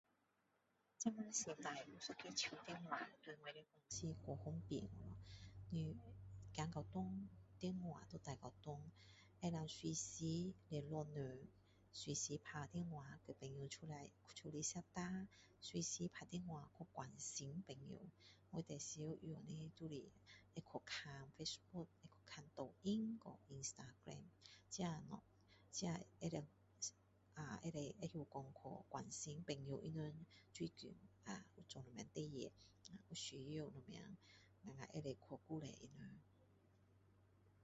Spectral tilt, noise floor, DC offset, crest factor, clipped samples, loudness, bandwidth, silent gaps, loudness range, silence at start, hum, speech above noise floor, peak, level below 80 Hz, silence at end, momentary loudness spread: -5 dB/octave; -84 dBFS; under 0.1%; 24 dB; under 0.1%; -51 LUFS; 8 kHz; none; 5 LU; 1 s; none; 33 dB; -28 dBFS; -74 dBFS; 0 s; 13 LU